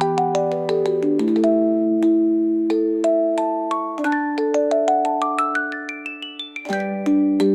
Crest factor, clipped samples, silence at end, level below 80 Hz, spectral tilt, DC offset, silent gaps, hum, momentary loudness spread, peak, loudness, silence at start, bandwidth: 12 dB; under 0.1%; 0 s; -70 dBFS; -6 dB/octave; under 0.1%; none; none; 9 LU; -8 dBFS; -20 LUFS; 0 s; 10.5 kHz